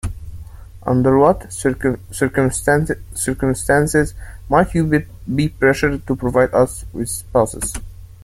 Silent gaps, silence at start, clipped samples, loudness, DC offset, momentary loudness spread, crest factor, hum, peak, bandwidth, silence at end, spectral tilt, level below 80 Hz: none; 0.05 s; under 0.1%; -18 LUFS; under 0.1%; 11 LU; 16 dB; none; -2 dBFS; 16.5 kHz; 0 s; -6 dB/octave; -34 dBFS